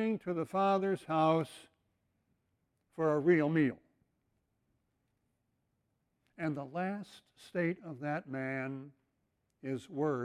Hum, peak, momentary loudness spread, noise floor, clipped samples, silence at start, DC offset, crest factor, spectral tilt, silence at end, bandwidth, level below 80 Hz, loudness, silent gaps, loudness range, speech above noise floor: none; -16 dBFS; 16 LU; -81 dBFS; under 0.1%; 0 s; under 0.1%; 20 dB; -7.5 dB/octave; 0 s; 12.5 kHz; -78 dBFS; -34 LUFS; none; 11 LU; 47 dB